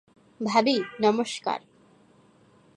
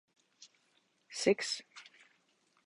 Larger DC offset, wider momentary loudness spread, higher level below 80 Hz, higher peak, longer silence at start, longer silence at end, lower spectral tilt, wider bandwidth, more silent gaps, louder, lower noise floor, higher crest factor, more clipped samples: neither; second, 11 LU vs 23 LU; first, -74 dBFS vs -80 dBFS; first, -8 dBFS vs -14 dBFS; about the same, 0.4 s vs 0.4 s; first, 1.2 s vs 0.85 s; first, -4.5 dB/octave vs -3 dB/octave; about the same, 11.5 kHz vs 11.5 kHz; neither; first, -26 LUFS vs -34 LUFS; second, -59 dBFS vs -74 dBFS; second, 20 dB vs 26 dB; neither